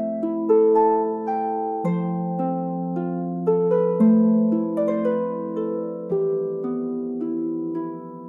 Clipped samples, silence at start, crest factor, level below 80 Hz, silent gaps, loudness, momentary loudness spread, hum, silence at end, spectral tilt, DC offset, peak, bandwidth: under 0.1%; 0 s; 14 dB; -68 dBFS; none; -22 LUFS; 10 LU; none; 0 s; -11.5 dB/octave; under 0.1%; -8 dBFS; 3.3 kHz